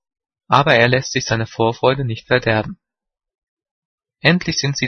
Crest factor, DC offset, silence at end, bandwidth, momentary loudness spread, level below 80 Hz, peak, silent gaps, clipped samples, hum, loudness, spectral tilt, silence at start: 18 dB; under 0.1%; 0 s; 6.6 kHz; 8 LU; -48 dBFS; 0 dBFS; 3.38-3.57 s, 3.71-3.98 s; under 0.1%; none; -17 LUFS; -4.5 dB/octave; 0.5 s